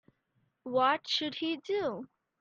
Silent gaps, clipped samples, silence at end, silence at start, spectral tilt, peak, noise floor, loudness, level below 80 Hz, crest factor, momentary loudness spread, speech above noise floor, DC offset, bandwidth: none; under 0.1%; 0.35 s; 0.65 s; -3.5 dB/octave; -16 dBFS; -76 dBFS; -31 LUFS; -78 dBFS; 18 dB; 18 LU; 45 dB; under 0.1%; 7.8 kHz